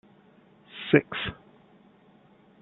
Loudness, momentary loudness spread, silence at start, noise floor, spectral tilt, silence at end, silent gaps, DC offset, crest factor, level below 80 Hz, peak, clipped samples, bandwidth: -26 LUFS; 23 LU; 0.75 s; -58 dBFS; -4.5 dB/octave; 1.25 s; none; under 0.1%; 28 dB; -60 dBFS; -4 dBFS; under 0.1%; 4.2 kHz